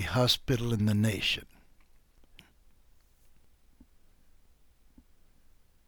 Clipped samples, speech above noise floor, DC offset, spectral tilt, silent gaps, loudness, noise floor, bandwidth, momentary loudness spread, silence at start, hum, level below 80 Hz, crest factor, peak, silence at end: under 0.1%; 32 dB; under 0.1%; -5 dB/octave; none; -28 LUFS; -61 dBFS; 19 kHz; 4 LU; 0 s; none; -52 dBFS; 22 dB; -12 dBFS; 4.45 s